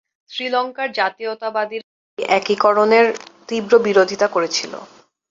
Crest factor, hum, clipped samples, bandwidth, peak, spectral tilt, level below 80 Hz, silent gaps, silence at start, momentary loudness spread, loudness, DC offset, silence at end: 18 dB; none; under 0.1%; 7.8 kHz; -2 dBFS; -3.5 dB/octave; -66 dBFS; 1.84-2.17 s; 0.3 s; 17 LU; -18 LUFS; under 0.1%; 0.45 s